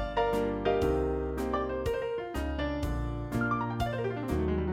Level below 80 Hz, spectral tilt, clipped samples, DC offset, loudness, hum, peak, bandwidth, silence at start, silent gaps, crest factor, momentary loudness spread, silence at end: -40 dBFS; -7 dB/octave; under 0.1%; under 0.1%; -31 LUFS; none; -16 dBFS; 16 kHz; 0 s; none; 16 dB; 5 LU; 0 s